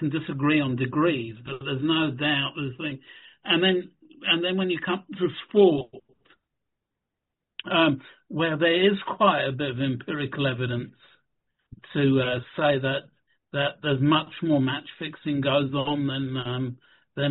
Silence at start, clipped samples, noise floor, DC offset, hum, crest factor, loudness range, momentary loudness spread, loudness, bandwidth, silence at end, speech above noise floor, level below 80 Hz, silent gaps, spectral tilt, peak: 0 s; under 0.1%; -84 dBFS; under 0.1%; none; 20 dB; 3 LU; 12 LU; -25 LUFS; 4.2 kHz; 0 s; 59 dB; -62 dBFS; none; -4 dB/octave; -6 dBFS